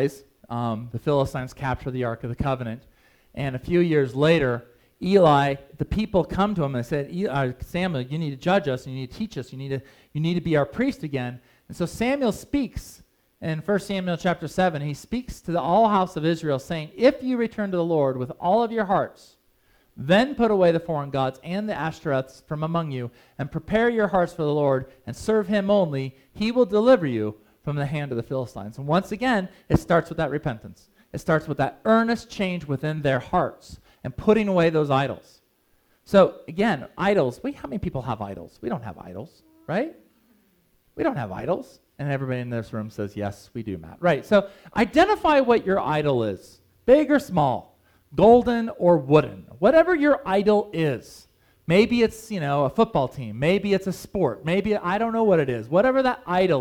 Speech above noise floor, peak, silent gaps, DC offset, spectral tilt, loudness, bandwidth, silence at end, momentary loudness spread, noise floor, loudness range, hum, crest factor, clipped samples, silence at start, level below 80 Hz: 42 dB; -4 dBFS; none; under 0.1%; -7 dB/octave; -23 LUFS; 17.5 kHz; 0 s; 13 LU; -65 dBFS; 7 LU; none; 20 dB; under 0.1%; 0 s; -48 dBFS